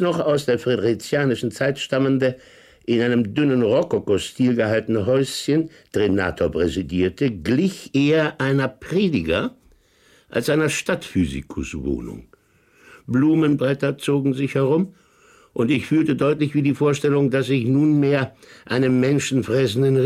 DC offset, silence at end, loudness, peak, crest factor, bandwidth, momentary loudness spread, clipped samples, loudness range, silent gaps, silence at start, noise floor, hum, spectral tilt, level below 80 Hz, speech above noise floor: under 0.1%; 0 s; -21 LUFS; -6 dBFS; 14 dB; 15 kHz; 7 LU; under 0.1%; 4 LU; none; 0 s; -57 dBFS; none; -6.5 dB/octave; -48 dBFS; 37 dB